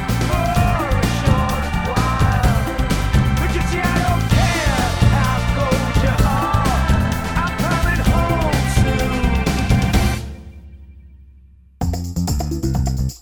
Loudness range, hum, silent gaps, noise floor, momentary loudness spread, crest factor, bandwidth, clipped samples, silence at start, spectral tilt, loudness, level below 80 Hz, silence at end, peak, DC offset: 5 LU; none; none; -46 dBFS; 5 LU; 14 dB; 20 kHz; under 0.1%; 0 s; -5.5 dB/octave; -18 LUFS; -22 dBFS; 0.05 s; -2 dBFS; under 0.1%